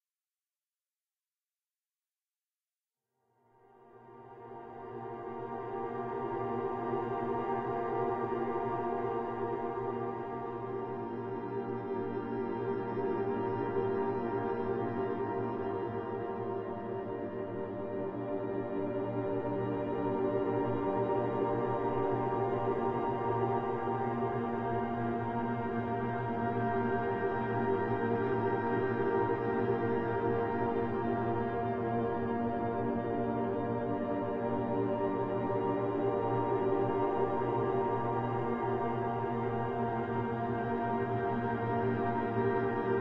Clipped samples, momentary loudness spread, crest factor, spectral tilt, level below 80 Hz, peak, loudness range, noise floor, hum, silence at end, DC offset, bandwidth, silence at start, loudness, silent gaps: under 0.1%; 7 LU; 16 dB; -10 dB/octave; -62 dBFS; -18 dBFS; 5 LU; under -90 dBFS; none; 0 s; under 0.1%; 5.2 kHz; 3.8 s; -34 LUFS; none